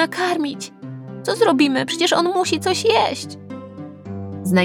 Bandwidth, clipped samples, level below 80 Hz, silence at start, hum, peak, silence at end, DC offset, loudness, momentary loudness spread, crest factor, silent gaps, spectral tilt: 18 kHz; under 0.1%; -72 dBFS; 0 s; none; -2 dBFS; 0 s; under 0.1%; -19 LUFS; 18 LU; 18 dB; none; -4.5 dB/octave